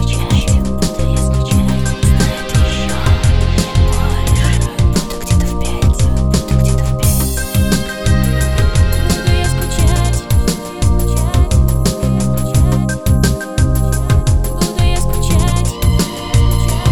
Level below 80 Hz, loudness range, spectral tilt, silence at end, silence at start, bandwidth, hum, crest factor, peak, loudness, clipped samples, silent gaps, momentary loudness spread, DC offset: -16 dBFS; 1 LU; -5.5 dB/octave; 0 s; 0 s; 17 kHz; none; 12 dB; 0 dBFS; -15 LUFS; under 0.1%; none; 3 LU; under 0.1%